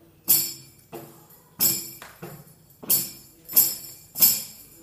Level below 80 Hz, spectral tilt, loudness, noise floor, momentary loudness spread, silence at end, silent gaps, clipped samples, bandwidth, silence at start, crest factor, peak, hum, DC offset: -66 dBFS; -0.5 dB/octave; -20 LUFS; -52 dBFS; 25 LU; 0.2 s; none; under 0.1%; 16 kHz; 0.25 s; 26 dB; 0 dBFS; none; under 0.1%